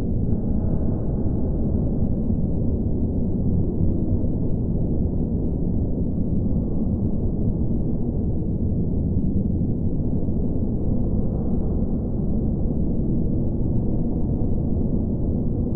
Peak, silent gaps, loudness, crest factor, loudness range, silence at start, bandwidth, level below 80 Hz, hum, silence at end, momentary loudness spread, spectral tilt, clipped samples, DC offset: -8 dBFS; none; -24 LUFS; 14 dB; 1 LU; 0 s; 1.5 kHz; -26 dBFS; none; 0 s; 2 LU; -16 dB/octave; under 0.1%; under 0.1%